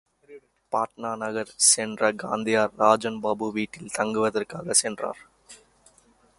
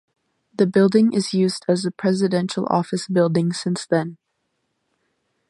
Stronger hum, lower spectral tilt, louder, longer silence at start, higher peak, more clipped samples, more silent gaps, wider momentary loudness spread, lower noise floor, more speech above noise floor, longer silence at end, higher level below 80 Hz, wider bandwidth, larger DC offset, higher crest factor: neither; second, -2 dB/octave vs -6 dB/octave; second, -24 LUFS vs -20 LUFS; second, 0.3 s vs 0.6 s; about the same, -4 dBFS vs -4 dBFS; neither; neither; first, 12 LU vs 7 LU; second, -60 dBFS vs -73 dBFS; second, 35 dB vs 54 dB; second, 0.85 s vs 1.35 s; about the same, -66 dBFS vs -68 dBFS; about the same, 12 kHz vs 11.5 kHz; neither; about the same, 22 dB vs 18 dB